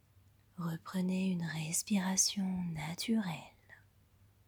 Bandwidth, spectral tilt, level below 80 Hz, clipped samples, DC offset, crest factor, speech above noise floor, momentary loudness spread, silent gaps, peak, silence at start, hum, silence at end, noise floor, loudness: over 20 kHz; -3.5 dB/octave; -70 dBFS; under 0.1%; under 0.1%; 20 dB; 31 dB; 13 LU; none; -18 dBFS; 0.55 s; none; 0.7 s; -66 dBFS; -35 LUFS